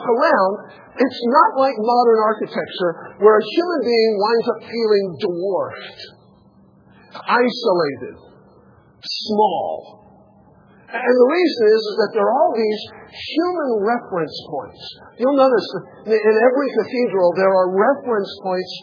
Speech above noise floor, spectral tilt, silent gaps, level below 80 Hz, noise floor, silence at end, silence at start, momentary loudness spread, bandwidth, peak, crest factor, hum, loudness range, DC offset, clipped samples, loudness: 33 dB; -6 dB/octave; none; -68 dBFS; -51 dBFS; 0 s; 0 s; 16 LU; 5.4 kHz; 0 dBFS; 18 dB; none; 6 LU; under 0.1%; under 0.1%; -18 LUFS